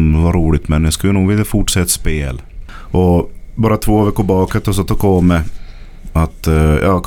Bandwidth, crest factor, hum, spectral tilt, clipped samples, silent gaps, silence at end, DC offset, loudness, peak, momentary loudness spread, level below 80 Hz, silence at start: 18 kHz; 12 dB; none; -6 dB/octave; under 0.1%; none; 0 s; under 0.1%; -14 LUFS; 0 dBFS; 7 LU; -22 dBFS; 0 s